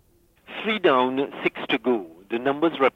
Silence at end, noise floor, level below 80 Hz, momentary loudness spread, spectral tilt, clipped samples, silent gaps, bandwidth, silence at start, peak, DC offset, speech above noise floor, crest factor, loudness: 0.05 s; -55 dBFS; -66 dBFS; 10 LU; -6.5 dB/octave; under 0.1%; none; 7 kHz; 0.5 s; -8 dBFS; under 0.1%; 32 dB; 16 dB; -24 LUFS